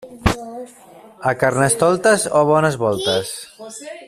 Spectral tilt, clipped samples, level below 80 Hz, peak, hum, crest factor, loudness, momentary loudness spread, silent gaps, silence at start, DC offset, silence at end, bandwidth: -4 dB/octave; under 0.1%; -38 dBFS; -2 dBFS; none; 16 dB; -17 LUFS; 19 LU; none; 0 s; under 0.1%; 0 s; 14.5 kHz